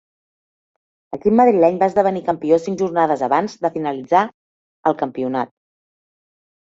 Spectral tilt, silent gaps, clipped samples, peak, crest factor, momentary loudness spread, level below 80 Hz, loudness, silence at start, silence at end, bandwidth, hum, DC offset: -7 dB/octave; 4.34-4.83 s; under 0.1%; -2 dBFS; 18 dB; 10 LU; -60 dBFS; -18 LUFS; 1.1 s; 1.2 s; 7.8 kHz; none; under 0.1%